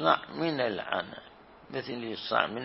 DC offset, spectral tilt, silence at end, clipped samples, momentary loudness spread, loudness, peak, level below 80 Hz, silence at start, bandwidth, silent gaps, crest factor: under 0.1%; -8.5 dB/octave; 0 s; under 0.1%; 12 LU; -32 LUFS; -6 dBFS; -68 dBFS; 0 s; 5.8 kHz; none; 26 dB